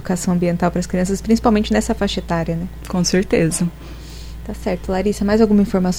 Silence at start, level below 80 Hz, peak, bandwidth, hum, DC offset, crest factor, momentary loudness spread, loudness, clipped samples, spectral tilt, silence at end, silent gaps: 0 s; -32 dBFS; -2 dBFS; over 20 kHz; none; under 0.1%; 16 dB; 14 LU; -18 LUFS; under 0.1%; -5.5 dB/octave; 0 s; none